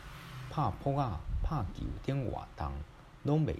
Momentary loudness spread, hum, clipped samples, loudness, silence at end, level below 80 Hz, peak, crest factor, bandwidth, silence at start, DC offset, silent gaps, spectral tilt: 12 LU; none; under 0.1%; -36 LUFS; 0 s; -44 dBFS; -18 dBFS; 18 dB; 13 kHz; 0 s; under 0.1%; none; -8.5 dB/octave